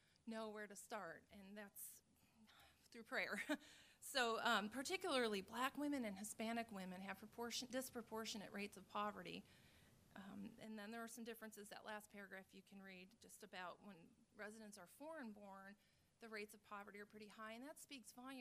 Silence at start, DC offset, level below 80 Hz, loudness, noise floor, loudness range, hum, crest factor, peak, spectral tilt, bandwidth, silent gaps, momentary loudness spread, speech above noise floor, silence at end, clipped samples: 0.25 s; under 0.1%; -84 dBFS; -50 LUFS; -74 dBFS; 13 LU; none; 24 dB; -26 dBFS; -3 dB/octave; 15.5 kHz; none; 19 LU; 23 dB; 0 s; under 0.1%